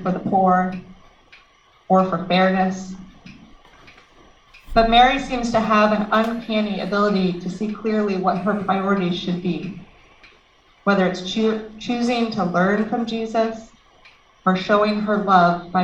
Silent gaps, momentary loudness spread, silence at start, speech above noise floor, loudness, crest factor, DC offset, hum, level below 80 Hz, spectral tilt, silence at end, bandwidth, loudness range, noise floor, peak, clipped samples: none; 11 LU; 0 s; 36 dB; -20 LUFS; 18 dB; under 0.1%; none; -42 dBFS; -6.5 dB/octave; 0 s; 8.4 kHz; 5 LU; -55 dBFS; -2 dBFS; under 0.1%